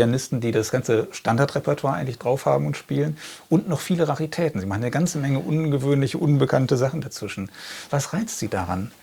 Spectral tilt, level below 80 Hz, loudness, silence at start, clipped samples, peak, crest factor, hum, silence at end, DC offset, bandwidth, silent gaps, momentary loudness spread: -6 dB/octave; -58 dBFS; -23 LUFS; 0 s; under 0.1%; -4 dBFS; 18 dB; none; 0.1 s; under 0.1%; 19.5 kHz; none; 7 LU